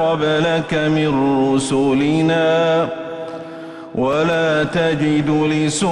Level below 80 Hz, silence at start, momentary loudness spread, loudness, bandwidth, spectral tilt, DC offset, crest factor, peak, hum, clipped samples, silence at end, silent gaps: -50 dBFS; 0 s; 12 LU; -17 LUFS; 11.5 kHz; -5.5 dB/octave; under 0.1%; 10 dB; -6 dBFS; none; under 0.1%; 0 s; none